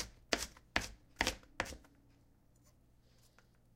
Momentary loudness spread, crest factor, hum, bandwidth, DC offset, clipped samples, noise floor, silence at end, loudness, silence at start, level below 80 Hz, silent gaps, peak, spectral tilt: 8 LU; 34 dB; 60 Hz at -70 dBFS; 16 kHz; under 0.1%; under 0.1%; -68 dBFS; 1.95 s; -40 LUFS; 0 s; -58 dBFS; none; -12 dBFS; -2 dB/octave